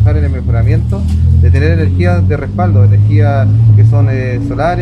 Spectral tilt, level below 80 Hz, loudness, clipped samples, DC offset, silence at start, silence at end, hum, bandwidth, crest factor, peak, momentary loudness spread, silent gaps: -9.5 dB/octave; -20 dBFS; -10 LUFS; under 0.1%; under 0.1%; 0 s; 0 s; none; 5.8 kHz; 8 dB; 0 dBFS; 6 LU; none